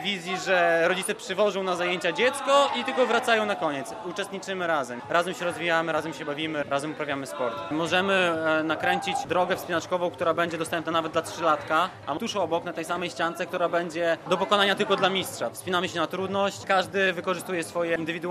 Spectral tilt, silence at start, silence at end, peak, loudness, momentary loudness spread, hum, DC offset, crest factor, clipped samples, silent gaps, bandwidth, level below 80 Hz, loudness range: -3.5 dB/octave; 0 s; 0 s; -6 dBFS; -26 LUFS; 8 LU; none; under 0.1%; 20 dB; under 0.1%; none; 14 kHz; -68 dBFS; 3 LU